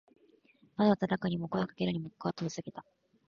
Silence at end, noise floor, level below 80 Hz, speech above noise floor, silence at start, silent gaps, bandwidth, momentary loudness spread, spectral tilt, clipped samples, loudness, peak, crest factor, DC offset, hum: 0.5 s; -66 dBFS; -66 dBFS; 33 dB; 0.8 s; none; 7.2 kHz; 16 LU; -7 dB/octave; under 0.1%; -33 LUFS; -14 dBFS; 20 dB; under 0.1%; none